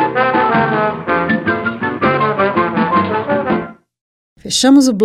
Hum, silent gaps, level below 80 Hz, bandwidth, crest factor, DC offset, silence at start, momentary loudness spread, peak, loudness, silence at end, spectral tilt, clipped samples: none; 4.01-4.36 s; -50 dBFS; 14 kHz; 14 dB; under 0.1%; 0 s; 8 LU; 0 dBFS; -14 LUFS; 0 s; -4.5 dB/octave; under 0.1%